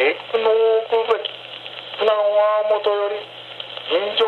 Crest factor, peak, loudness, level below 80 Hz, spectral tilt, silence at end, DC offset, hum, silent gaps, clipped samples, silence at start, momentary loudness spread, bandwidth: 16 dB; -4 dBFS; -19 LUFS; -78 dBFS; -4 dB/octave; 0 s; under 0.1%; none; none; under 0.1%; 0 s; 15 LU; 4.6 kHz